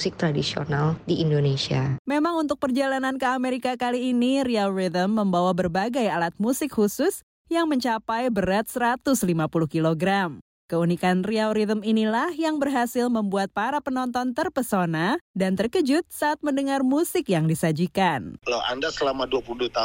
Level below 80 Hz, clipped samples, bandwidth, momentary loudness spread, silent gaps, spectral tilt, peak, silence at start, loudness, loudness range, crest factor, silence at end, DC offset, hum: -54 dBFS; under 0.1%; 16.5 kHz; 4 LU; 1.99-2.05 s, 7.23-7.45 s, 10.41-10.69 s, 15.21-15.34 s; -5.5 dB/octave; -8 dBFS; 0 s; -24 LUFS; 1 LU; 14 dB; 0 s; under 0.1%; none